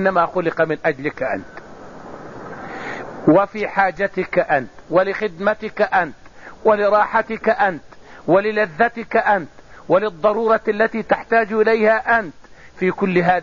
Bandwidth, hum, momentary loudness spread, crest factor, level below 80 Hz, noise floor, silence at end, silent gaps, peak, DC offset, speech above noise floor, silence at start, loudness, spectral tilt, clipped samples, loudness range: 7.2 kHz; none; 17 LU; 16 dB; -52 dBFS; -38 dBFS; 0 s; none; -4 dBFS; 0.6%; 20 dB; 0 s; -18 LUFS; -4.5 dB/octave; under 0.1%; 4 LU